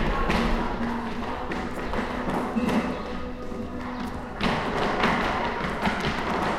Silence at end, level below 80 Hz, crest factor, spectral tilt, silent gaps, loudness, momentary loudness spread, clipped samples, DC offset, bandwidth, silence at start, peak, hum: 0 s; -36 dBFS; 18 dB; -5.5 dB/octave; none; -27 LUFS; 9 LU; under 0.1%; under 0.1%; 15 kHz; 0 s; -8 dBFS; none